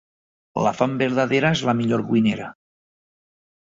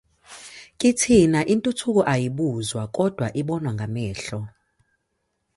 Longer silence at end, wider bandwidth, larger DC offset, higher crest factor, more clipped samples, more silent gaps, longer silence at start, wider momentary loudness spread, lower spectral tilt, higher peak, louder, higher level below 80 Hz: first, 1.25 s vs 1.1 s; second, 7.8 kHz vs 11.5 kHz; neither; about the same, 18 dB vs 18 dB; neither; neither; first, 0.55 s vs 0.3 s; second, 10 LU vs 21 LU; about the same, -6 dB/octave vs -5.5 dB/octave; about the same, -4 dBFS vs -4 dBFS; about the same, -21 LUFS vs -22 LUFS; second, -58 dBFS vs -50 dBFS